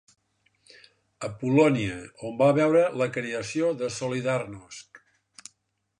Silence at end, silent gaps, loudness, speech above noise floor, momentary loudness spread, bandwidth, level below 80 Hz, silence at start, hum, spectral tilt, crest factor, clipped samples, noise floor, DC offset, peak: 1.05 s; none; -25 LUFS; 49 dB; 23 LU; 11 kHz; -62 dBFS; 1.2 s; none; -6 dB/octave; 18 dB; under 0.1%; -74 dBFS; under 0.1%; -8 dBFS